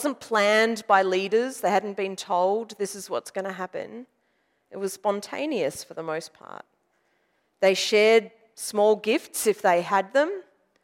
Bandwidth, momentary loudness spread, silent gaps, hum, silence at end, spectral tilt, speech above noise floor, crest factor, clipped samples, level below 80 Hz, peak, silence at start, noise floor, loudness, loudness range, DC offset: 16 kHz; 16 LU; none; none; 0.4 s; -3 dB/octave; 46 dB; 20 dB; under 0.1%; -78 dBFS; -6 dBFS; 0 s; -71 dBFS; -24 LUFS; 9 LU; under 0.1%